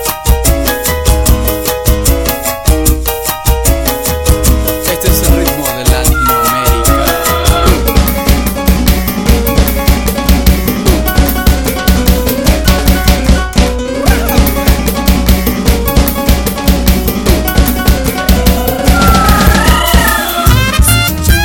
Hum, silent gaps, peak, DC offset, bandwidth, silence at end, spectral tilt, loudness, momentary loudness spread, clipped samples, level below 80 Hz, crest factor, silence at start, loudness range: none; none; 0 dBFS; 0.5%; 18 kHz; 0 s; -4.5 dB/octave; -10 LUFS; 4 LU; 0.4%; -12 dBFS; 10 dB; 0 s; 2 LU